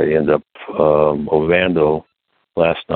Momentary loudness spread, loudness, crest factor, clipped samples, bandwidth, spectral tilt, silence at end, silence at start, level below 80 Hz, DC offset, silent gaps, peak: 9 LU; -16 LUFS; 14 dB; under 0.1%; 4.3 kHz; -10.5 dB/octave; 0 s; 0 s; -44 dBFS; under 0.1%; none; -2 dBFS